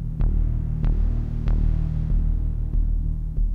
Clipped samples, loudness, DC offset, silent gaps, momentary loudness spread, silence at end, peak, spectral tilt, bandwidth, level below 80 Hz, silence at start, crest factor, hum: under 0.1%; -26 LUFS; under 0.1%; none; 3 LU; 0 s; -10 dBFS; -10.5 dB/octave; 2.6 kHz; -22 dBFS; 0 s; 10 dB; none